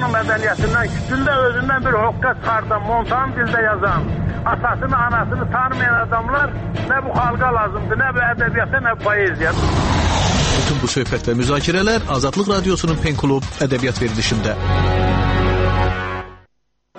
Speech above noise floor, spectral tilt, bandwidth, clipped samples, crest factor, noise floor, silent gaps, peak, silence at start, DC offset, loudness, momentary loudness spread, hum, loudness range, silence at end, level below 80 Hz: 50 dB; -5 dB/octave; 8.8 kHz; under 0.1%; 14 dB; -68 dBFS; none; -4 dBFS; 0 s; under 0.1%; -18 LUFS; 3 LU; none; 1 LU; 0 s; -28 dBFS